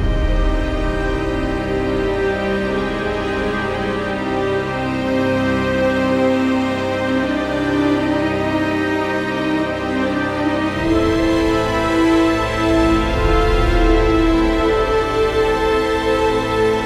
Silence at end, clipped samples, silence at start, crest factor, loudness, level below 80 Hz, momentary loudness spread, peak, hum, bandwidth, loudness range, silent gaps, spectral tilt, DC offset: 0 s; under 0.1%; 0 s; 14 dB; -18 LUFS; -26 dBFS; 5 LU; -4 dBFS; none; 13.5 kHz; 4 LU; none; -6 dB/octave; under 0.1%